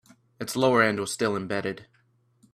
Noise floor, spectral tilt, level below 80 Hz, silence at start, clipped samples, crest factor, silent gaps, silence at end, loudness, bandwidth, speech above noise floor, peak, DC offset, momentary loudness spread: -63 dBFS; -4.5 dB/octave; -66 dBFS; 0.4 s; under 0.1%; 20 dB; none; 0.7 s; -25 LUFS; 15.5 kHz; 38 dB; -8 dBFS; under 0.1%; 15 LU